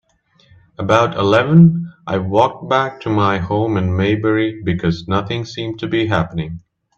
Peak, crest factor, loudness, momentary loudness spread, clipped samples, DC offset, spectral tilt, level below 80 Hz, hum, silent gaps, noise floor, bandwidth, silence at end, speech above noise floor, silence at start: 0 dBFS; 16 dB; -16 LUFS; 12 LU; under 0.1%; under 0.1%; -7.5 dB/octave; -48 dBFS; none; none; -55 dBFS; 7 kHz; 0.4 s; 39 dB; 0.8 s